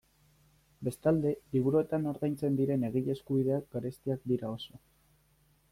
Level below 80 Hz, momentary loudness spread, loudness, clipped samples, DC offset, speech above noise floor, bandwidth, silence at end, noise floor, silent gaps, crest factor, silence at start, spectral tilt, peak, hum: -64 dBFS; 10 LU; -32 LUFS; under 0.1%; under 0.1%; 37 dB; 16 kHz; 0.95 s; -68 dBFS; none; 16 dB; 0.8 s; -8.5 dB/octave; -16 dBFS; none